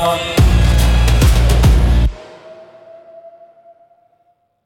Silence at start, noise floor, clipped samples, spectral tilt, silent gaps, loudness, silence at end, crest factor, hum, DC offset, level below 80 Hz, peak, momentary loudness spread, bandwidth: 0 s; -60 dBFS; under 0.1%; -5.5 dB/octave; none; -13 LUFS; 1.35 s; 14 dB; none; under 0.1%; -16 dBFS; 0 dBFS; 5 LU; 16.5 kHz